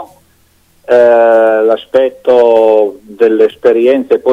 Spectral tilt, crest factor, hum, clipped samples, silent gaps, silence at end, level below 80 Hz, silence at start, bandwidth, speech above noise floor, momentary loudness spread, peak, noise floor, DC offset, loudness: -6 dB/octave; 10 dB; none; 0.7%; none; 0 s; -56 dBFS; 0 s; 8 kHz; 42 dB; 5 LU; 0 dBFS; -50 dBFS; under 0.1%; -9 LUFS